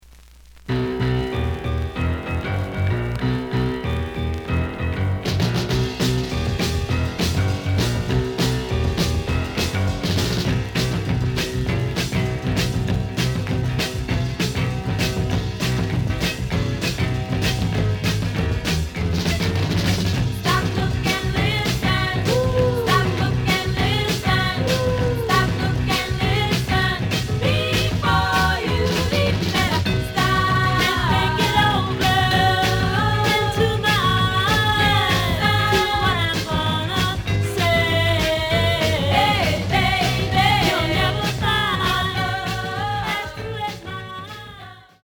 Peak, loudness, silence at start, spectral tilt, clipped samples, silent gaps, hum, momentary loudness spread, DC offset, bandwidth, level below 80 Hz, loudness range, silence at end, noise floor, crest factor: -4 dBFS; -20 LUFS; 0.55 s; -5 dB/octave; under 0.1%; none; none; 7 LU; under 0.1%; over 20 kHz; -32 dBFS; 5 LU; 0.25 s; -46 dBFS; 16 dB